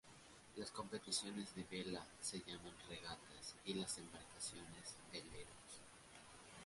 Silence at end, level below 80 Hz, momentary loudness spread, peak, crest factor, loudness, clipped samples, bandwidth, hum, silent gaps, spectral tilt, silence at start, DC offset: 0 s; -74 dBFS; 15 LU; -28 dBFS; 22 dB; -50 LUFS; under 0.1%; 11.5 kHz; none; none; -2.5 dB/octave; 0.05 s; under 0.1%